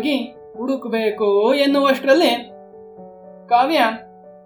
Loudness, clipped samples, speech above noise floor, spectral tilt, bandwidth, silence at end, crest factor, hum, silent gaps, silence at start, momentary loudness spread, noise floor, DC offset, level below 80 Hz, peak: -18 LUFS; under 0.1%; 23 dB; -4 dB/octave; 18 kHz; 0.15 s; 16 dB; none; none; 0 s; 13 LU; -40 dBFS; under 0.1%; -68 dBFS; -2 dBFS